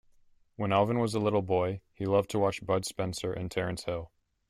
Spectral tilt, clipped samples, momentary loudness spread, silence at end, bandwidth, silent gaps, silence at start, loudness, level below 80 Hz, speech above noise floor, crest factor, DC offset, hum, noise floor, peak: -6 dB/octave; under 0.1%; 9 LU; 0.45 s; 15.5 kHz; none; 0.6 s; -30 LUFS; -58 dBFS; 33 dB; 18 dB; under 0.1%; none; -63 dBFS; -12 dBFS